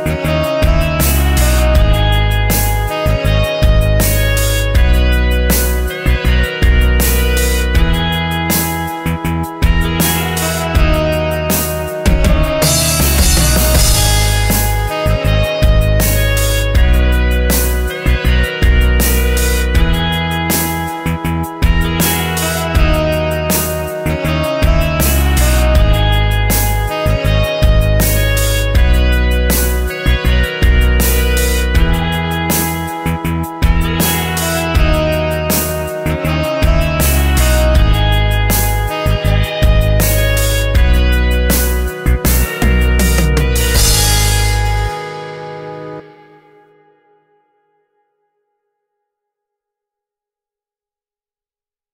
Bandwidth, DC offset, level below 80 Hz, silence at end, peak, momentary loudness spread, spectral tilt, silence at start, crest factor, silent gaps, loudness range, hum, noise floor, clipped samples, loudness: 16.5 kHz; under 0.1%; -14 dBFS; 5.85 s; 0 dBFS; 5 LU; -4.5 dB/octave; 0 s; 12 dB; none; 3 LU; none; under -90 dBFS; under 0.1%; -13 LUFS